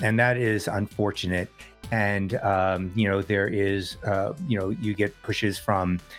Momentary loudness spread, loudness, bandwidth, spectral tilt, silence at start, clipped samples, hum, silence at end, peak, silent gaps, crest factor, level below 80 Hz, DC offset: 5 LU; -26 LUFS; 16 kHz; -6 dB/octave; 0 s; under 0.1%; none; 0 s; -6 dBFS; none; 18 dB; -54 dBFS; under 0.1%